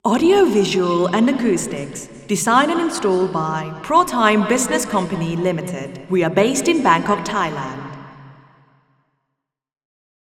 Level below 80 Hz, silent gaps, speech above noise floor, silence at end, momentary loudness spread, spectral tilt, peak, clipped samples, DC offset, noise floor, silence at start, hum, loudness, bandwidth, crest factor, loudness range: -54 dBFS; none; 61 dB; 2 s; 13 LU; -4.5 dB/octave; 0 dBFS; under 0.1%; under 0.1%; -78 dBFS; 0.05 s; none; -18 LUFS; 16.5 kHz; 18 dB; 4 LU